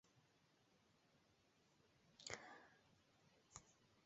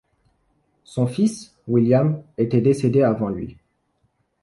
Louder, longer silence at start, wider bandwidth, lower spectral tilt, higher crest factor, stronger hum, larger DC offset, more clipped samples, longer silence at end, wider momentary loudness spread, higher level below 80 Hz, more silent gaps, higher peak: second, -59 LUFS vs -20 LUFS; second, 0.05 s vs 0.9 s; second, 7.6 kHz vs 11.5 kHz; second, -1.5 dB/octave vs -8 dB/octave; first, 38 dB vs 16 dB; neither; neither; neither; second, 0 s vs 0.9 s; second, 9 LU vs 14 LU; second, -88 dBFS vs -54 dBFS; neither; second, -28 dBFS vs -6 dBFS